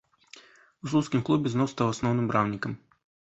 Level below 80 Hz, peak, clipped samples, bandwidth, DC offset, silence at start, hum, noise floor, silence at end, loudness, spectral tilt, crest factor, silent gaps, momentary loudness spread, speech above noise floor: -60 dBFS; -8 dBFS; under 0.1%; 8.2 kHz; under 0.1%; 0.35 s; none; -54 dBFS; 0.55 s; -27 LUFS; -6.5 dB/octave; 20 dB; none; 10 LU; 28 dB